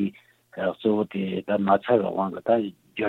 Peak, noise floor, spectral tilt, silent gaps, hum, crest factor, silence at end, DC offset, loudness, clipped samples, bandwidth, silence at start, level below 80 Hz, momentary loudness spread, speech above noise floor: -6 dBFS; -48 dBFS; -8.5 dB/octave; none; none; 18 dB; 0 s; under 0.1%; -25 LUFS; under 0.1%; 4.2 kHz; 0 s; -68 dBFS; 9 LU; 25 dB